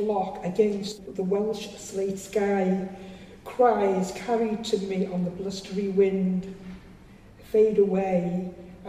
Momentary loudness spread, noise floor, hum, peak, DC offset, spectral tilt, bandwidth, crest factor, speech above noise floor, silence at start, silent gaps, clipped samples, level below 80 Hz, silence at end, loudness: 16 LU; -49 dBFS; none; -8 dBFS; under 0.1%; -6.5 dB/octave; 14 kHz; 18 dB; 24 dB; 0 s; none; under 0.1%; -56 dBFS; 0 s; -26 LUFS